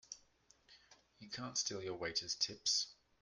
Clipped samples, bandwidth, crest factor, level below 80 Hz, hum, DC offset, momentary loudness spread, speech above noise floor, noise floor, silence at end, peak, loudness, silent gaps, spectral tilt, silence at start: under 0.1%; 11.5 kHz; 22 dB; -76 dBFS; none; under 0.1%; 18 LU; 30 dB; -71 dBFS; 0.3 s; -22 dBFS; -39 LUFS; none; -1 dB/octave; 0.1 s